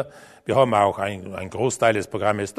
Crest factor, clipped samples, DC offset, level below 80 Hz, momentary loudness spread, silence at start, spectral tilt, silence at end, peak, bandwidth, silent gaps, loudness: 18 dB; under 0.1%; under 0.1%; -58 dBFS; 14 LU; 0 s; -5 dB/octave; 0.1 s; -4 dBFS; 13.5 kHz; none; -21 LUFS